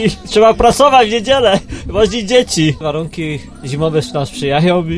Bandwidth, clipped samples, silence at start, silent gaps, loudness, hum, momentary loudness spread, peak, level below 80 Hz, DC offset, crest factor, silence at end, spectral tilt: 11 kHz; under 0.1%; 0 s; none; -13 LUFS; none; 12 LU; 0 dBFS; -32 dBFS; under 0.1%; 12 dB; 0 s; -5 dB/octave